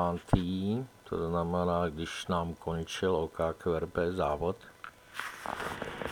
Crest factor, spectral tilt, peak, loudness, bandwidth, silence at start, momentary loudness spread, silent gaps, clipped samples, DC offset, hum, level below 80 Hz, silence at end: 24 dB; -6.5 dB/octave; -10 dBFS; -33 LUFS; 19.5 kHz; 0 s; 9 LU; none; under 0.1%; under 0.1%; none; -50 dBFS; 0 s